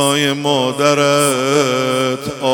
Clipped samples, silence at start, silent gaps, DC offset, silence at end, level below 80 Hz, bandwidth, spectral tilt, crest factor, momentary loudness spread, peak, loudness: under 0.1%; 0 s; none; under 0.1%; 0 s; -56 dBFS; 17 kHz; -3.5 dB/octave; 14 dB; 5 LU; 0 dBFS; -14 LUFS